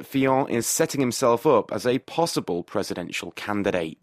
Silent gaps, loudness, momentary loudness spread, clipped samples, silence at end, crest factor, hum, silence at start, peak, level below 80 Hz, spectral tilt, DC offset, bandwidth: none; -24 LUFS; 8 LU; under 0.1%; 0.1 s; 18 dB; none; 0 s; -6 dBFS; -62 dBFS; -4.5 dB/octave; under 0.1%; 15.5 kHz